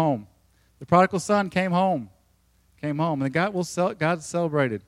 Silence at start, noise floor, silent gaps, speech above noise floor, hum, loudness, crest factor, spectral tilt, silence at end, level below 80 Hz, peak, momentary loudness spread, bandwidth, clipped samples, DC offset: 0 s; -63 dBFS; none; 40 dB; none; -24 LUFS; 20 dB; -6 dB/octave; 0.1 s; -62 dBFS; -4 dBFS; 11 LU; 13.5 kHz; under 0.1%; under 0.1%